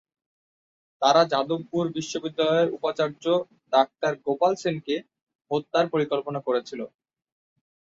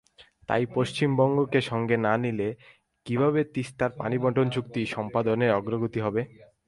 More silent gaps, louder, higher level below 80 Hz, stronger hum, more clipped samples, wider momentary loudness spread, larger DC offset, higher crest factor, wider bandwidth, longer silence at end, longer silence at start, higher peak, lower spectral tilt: first, 5.22-5.26 s, 5.35-5.39 s vs none; about the same, -25 LUFS vs -26 LUFS; second, -72 dBFS vs -60 dBFS; neither; neither; about the same, 10 LU vs 9 LU; neither; about the same, 20 dB vs 18 dB; second, 7.8 kHz vs 11.5 kHz; first, 1.05 s vs 0.25 s; first, 1 s vs 0.2 s; about the same, -6 dBFS vs -8 dBFS; second, -5 dB/octave vs -7 dB/octave